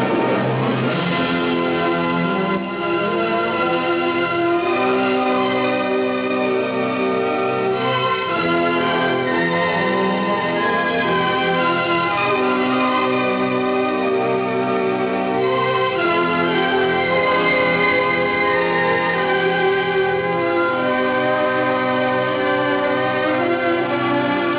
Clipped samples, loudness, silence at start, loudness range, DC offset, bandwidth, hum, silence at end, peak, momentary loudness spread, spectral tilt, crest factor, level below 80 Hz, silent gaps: under 0.1%; -18 LUFS; 0 s; 2 LU; under 0.1%; 4 kHz; none; 0 s; -6 dBFS; 3 LU; -9 dB/octave; 12 dB; -54 dBFS; none